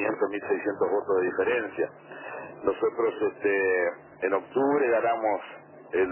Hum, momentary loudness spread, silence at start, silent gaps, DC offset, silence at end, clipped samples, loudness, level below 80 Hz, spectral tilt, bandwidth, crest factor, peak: none; 11 LU; 0 s; none; under 0.1%; 0 s; under 0.1%; -27 LUFS; -66 dBFS; -9.5 dB/octave; 3.2 kHz; 16 dB; -12 dBFS